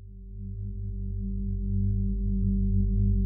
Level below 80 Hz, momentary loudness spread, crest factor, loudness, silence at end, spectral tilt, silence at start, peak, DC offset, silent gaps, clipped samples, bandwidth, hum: -30 dBFS; 12 LU; 12 dB; -30 LUFS; 0 s; -16.5 dB/octave; 0 s; -16 dBFS; under 0.1%; none; under 0.1%; 0.4 kHz; 50 Hz at -40 dBFS